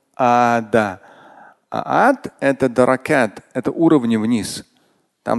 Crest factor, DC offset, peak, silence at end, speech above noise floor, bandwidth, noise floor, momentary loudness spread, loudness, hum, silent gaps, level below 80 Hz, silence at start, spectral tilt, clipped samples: 18 dB; under 0.1%; 0 dBFS; 0 s; 44 dB; 12.5 kHz; -61 dBFS; 13 LU; -17 LUFS; none; none; -54 dBFS; 0.2 s; -6 dB/octave; under 0.1%